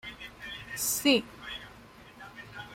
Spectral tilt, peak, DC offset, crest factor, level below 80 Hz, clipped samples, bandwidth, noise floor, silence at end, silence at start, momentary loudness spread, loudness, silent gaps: -2 dB/octave; -12 dBFS; under 0.1%; 22 dB; -60 dBFS; under 0.1%; 16.5 kHz; -52 dBFS; 0 s; 0.05 s; 24 LU; -29 LUFS; none